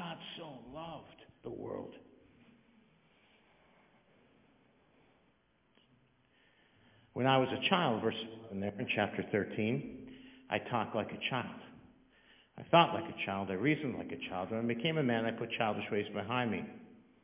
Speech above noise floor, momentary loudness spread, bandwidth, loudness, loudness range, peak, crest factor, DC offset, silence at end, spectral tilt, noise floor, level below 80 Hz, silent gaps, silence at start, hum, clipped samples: 38 dB; 18 LU; 3.9 kHz; -35 LUFS; 16 LU; -10 dBFS; 28 dB; under 0.1%; 0.25 s; -3.5 dB/octave; -73 dBFS; -70 dBFS; none; 0 s; none; under 0.1%